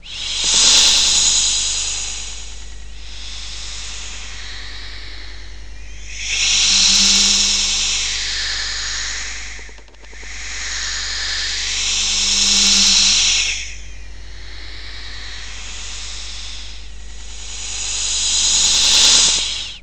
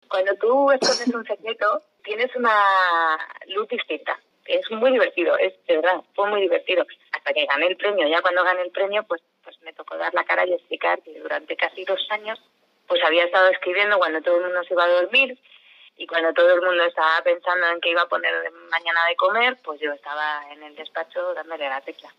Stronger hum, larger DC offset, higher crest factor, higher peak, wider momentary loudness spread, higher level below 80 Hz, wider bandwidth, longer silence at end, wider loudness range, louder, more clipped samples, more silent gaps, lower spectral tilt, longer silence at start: neither; first, 3% vs under 0.1%; about the same, 20 dB vs 16 dB; first, 0 dBFS vs -6 dBFS; first, 23 LU vs 12 LU; first, -36 dBFS vs -82 dBFS; first, 17 kHz vs 11 kHz; about the same, 0 s vs 0.1 s; first, 16 LU vs 4 LU; first, -13 LUFS vs -21 LUFS; neither; neither; second, 1 dB/octave vs -2 dB/octave; about the same, 0 s vs 0.1 s